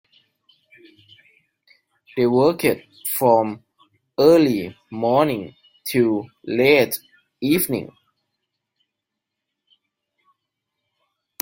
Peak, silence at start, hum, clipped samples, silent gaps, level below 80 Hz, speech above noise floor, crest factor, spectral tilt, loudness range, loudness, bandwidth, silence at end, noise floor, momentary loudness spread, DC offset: 0 dBFS; 2.15 s; none; under 0.1%; none; -62 dBFS; 64 dB; 22 dB; -5 dB/octave; 9 LU; -19 LUFS; 16.5 kHz; 3.55 s; -82 dBFS; 17 LU; under 0.1%